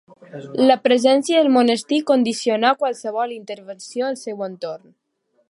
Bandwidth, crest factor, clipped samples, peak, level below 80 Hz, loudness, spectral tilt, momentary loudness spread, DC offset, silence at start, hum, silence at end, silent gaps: 11.5 kHz; 18 dB; under 0.1%; -2 dBFS; -74 dBFS; -19 LUFS; -4 dB/octave; 17 LU; under 0.1%; 0.35 s; none; 0.7 s; none